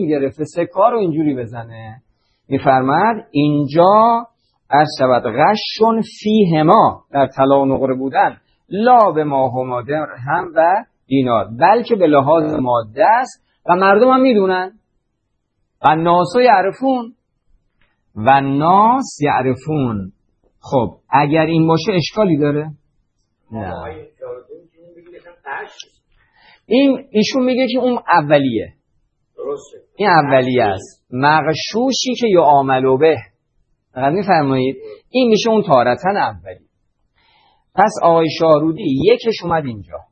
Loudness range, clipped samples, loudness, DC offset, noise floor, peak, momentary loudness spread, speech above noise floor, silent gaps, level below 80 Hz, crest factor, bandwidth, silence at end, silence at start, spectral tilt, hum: 4 LU; under 0.1%; -15 LUFS; under 0.1%; -70 dBFS; 0 dBFS; 16 LU; 56 dB; none; -54 dBFS; 16 dB; 8.8 kHz; 0.1 s; 0 s; -6 dB/octave; none